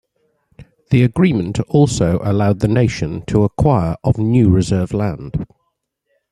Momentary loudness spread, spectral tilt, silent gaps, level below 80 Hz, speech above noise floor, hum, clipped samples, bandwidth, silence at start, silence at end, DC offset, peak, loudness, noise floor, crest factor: 9 LU; -7.5 dB/octave; none; -38 dBFS; 56 dB; none; under 0.1%; 11.5 kHz; 0.6 s; 0.85 s; under 0.1%; -2 dBFS; -16 LUFS; -70 dBFS; 14 dB